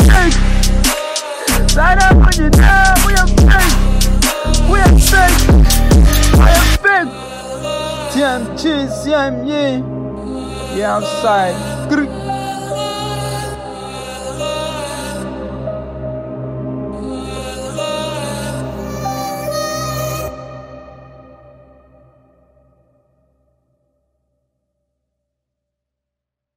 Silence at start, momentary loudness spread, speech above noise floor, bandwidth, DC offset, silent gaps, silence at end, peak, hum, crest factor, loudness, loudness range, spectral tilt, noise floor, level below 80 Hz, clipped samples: 0 s; 15 LU; 66 dB; 16.5 kHz; under 0.1%; none; 5.55 s; 0 dBFS; none; 14 dB; -14 LUFS; 13 LU; -4.5 dB/octave; -82 dBFS; -16 dBFS; under 0.1%